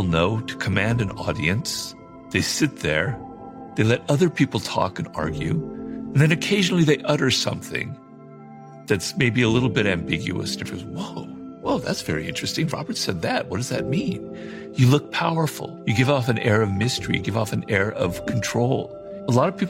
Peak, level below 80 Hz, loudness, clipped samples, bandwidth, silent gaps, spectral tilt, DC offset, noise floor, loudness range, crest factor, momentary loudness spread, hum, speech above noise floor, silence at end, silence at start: -4 dBFS; -48 dBFS; -23 LUFS; under 0.1%; 16.5 kHz; none; -5 dB/octave; under 0.1%; -43 dBFS; 4 LU; 18 dB; 13 LU; none; 21 dB; 0 s; 0 s